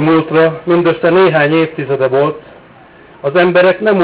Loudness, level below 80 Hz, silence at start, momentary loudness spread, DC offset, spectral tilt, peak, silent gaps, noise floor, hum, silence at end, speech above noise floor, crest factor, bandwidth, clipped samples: -11 LUFS; -54 dBFS; 0 s; 7 LU; under 0.1%; -10.5 dB/octave; -2 dBFS; none; -40 dBFS; none; 0 s; 29 dB; 10 dB; 4 kHz; under 0.1%